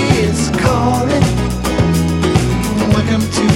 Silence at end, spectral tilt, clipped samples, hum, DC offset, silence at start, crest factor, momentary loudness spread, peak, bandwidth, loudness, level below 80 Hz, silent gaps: 0 s; -5.5 dB/octave; under 0.1%; none; under 0.1%; 0 s; 12 dB; 2 LU; 0 dBFS; 16.5 kHz; -14 LUFS; -26 dBFS; none